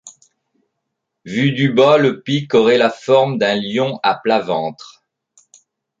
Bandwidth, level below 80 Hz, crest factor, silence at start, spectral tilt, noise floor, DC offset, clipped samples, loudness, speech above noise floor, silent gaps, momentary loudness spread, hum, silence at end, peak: 7.8 kHz; -62 dBFS; 16 dB; 0.05 s; -6 dB/octave; -76 dBFS; under 0.1%; under 0.1%; -16 LUFS; 61 dB; none; 9 LU; none; 1.25 s; -2 dBFS